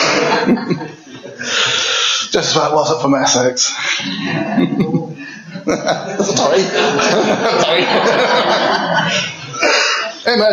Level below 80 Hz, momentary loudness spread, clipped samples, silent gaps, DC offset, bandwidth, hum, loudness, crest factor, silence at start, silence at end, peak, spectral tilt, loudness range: -56 dBFS; 9 LU; under 0.1%; none; under 0.1%; 12 kHz; none; -14 LUFS; 12 dB; 0 s; 0 s; -2 dBFS; -3 dB/octave; 3 LU